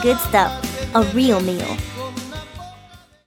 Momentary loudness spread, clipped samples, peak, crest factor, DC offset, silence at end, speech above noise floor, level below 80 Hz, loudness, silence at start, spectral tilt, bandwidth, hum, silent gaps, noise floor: 18 LU; under 0.1%; -2 dBFS; 18 dB; under 0.1%; 0.3 s; 29 dB; -38 dBFS; -19 LUFS; 0 s; -5 dB/octave; 19 kHz; none; none; -46 dBFS